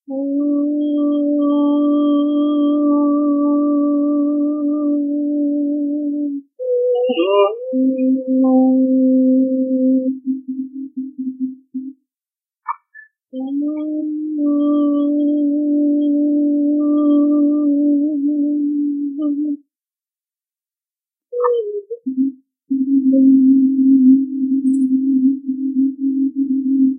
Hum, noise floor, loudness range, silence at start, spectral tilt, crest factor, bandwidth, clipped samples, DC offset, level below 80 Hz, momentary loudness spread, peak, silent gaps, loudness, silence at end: none; under -90 dBFS; 10 LU; 0.1 s; -8 dB/octave; 14 dB; 3.4 kHz; under 0.1%; under 0.1%; -84 dBFS; 12 LU; -2 dBFS; none; -17 LUFS; 0 s